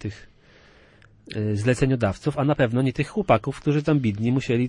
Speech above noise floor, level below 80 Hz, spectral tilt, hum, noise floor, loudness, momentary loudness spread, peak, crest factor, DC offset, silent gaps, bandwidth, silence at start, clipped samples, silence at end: 31 dB; -48 dBFS; -7.5 dB/octave; none; -53 dBFS; -23 LUFS; 6 LU; -6 dBFS; 18 dB; under 0.1%; none; 11 kHz; 0 s; under 0.1%; 0 s